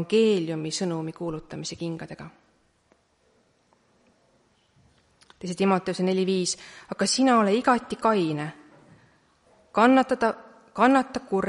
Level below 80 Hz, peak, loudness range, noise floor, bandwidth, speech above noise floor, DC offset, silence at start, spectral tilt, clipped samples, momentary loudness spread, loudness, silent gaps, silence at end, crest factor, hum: -64 dBFS; -6 dBFS; 15 LU; -66 dBFS; 11.5 kHz; 42 dB; under 0.1%; 0 s; -4.5 dB/octave; under 0.1%; 17 LU; -24 LUFS; none; 0 s; 20 dB; none